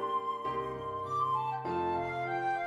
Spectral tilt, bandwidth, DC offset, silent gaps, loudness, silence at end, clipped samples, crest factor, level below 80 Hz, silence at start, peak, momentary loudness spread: -6.5 dB/octave; 12 kHz; under 0.1%; none; -34 LUFS; 0 s; under 0.1%; 12 dB; -64 dBFS; 0 s; -22 dBFS; 5 LU